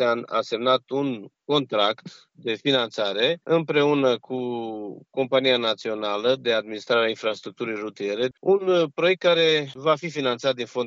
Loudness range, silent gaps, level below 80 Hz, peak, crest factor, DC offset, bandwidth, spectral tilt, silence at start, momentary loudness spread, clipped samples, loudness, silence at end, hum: 2 LU; none; -80 dBFS; -6 dBFS; 18 dB; under 0.1%; 7.6 kHz; -5 dB/octave; 0 s; 10 LU; under 0.1%; -23 LUFS; 0 s; none